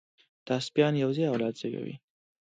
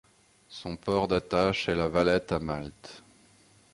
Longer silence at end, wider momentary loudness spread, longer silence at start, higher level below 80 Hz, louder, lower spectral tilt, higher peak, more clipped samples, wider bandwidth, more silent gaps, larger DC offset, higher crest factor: second, 0.55 s vs 0.75 s; second, 13 LU vs 19 LU; about the same, 0.45 s vs 0.5 s; second, -74 dBFS vs -50 dBFS; about the same, -29 LUFS vs -28 LUFS; about the same, -6.5 dB/octave vs -6 dB/octave; about the same, -10 dBFS vs -10 dBFS; neither; second, 9.2 kHz vs 11.5 kHz; neither; neither; about the same, 20 dB vs 20 dB